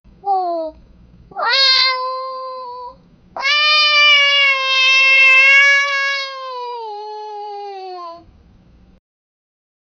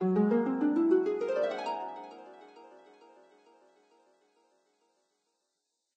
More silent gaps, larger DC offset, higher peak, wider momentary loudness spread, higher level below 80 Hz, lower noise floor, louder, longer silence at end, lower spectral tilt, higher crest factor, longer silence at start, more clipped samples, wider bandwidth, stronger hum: neither; neither; first, 0 dBFS vs -16 dBFS; about the same, 22 LU vs 23 LU; first, -56 dBFS vs -84 dBFS; second, -48 dBFS vs -83 dBFS; first, -11 LUFS vs -30 LUFS; second, 1.8 s vs 3.3 s; second, 0.5 dB/octave vs -8.5 dB/octave; about the same, 16 dB vs 18 dB; first, 0.25 s vs 0 s; neither; about the same, 8.6 kHz vs 8.2 kHz; neither